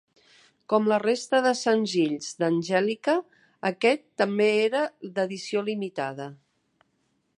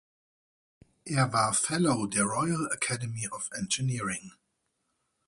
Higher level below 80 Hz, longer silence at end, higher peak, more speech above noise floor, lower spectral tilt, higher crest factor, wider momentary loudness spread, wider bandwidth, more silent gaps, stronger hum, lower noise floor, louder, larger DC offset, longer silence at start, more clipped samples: second, -80 dBFS vs -64 dBFS; about the same, 1.05 s vs 1 s; first, -6 dBFS vs -12 dBFS; about the same, 47 dB vs 49 dB; about the same, -4.5 dB/octave vs -4 dB/octave; about the same, 20 dB vs 20 dB; about the same, 9 LU vs 9 LU; about the same, 11 kHz vs 11.5 kHz; neither; neither; second, -72 dBFS vs -78 dBFS; first, -25 LUFS vs -29 LUFS; neither; second, 0.7 s vs 1.05 s; neither